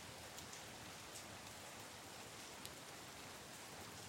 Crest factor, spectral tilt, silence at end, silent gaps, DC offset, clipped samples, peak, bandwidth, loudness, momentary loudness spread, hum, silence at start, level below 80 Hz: 24 dB; -2 dB/octave; 0 s; none; under 0.1%; under 0.1%; -30 dBFS; 16.5 kHz; -53 LUFS; 1 LU; none; 0 s; -76 dBFS